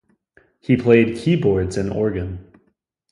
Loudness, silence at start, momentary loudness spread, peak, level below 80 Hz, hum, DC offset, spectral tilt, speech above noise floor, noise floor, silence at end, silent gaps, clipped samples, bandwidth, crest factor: -19 LUFS; 0.7 s; 16 LU; 0 dBFS; -42 dBFS; none; under 0.1%; -7.5 dB/octave; 49 dB; -67 dBFS; 0.7 s; none; under 0.1%; 11 kHz; 20 dB